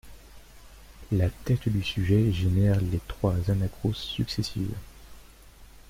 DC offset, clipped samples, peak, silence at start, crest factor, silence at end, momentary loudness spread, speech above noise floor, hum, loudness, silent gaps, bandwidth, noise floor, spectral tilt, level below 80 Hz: under 0.1%; under 0.1%; -12 dBFS; 0.05 s; 16 dB; 0.25 s; 8 LU; 25 dB; none; -27 LUFS; none; 16 kHz; -50 dBFS; -7 dB/octave; -44 dBFS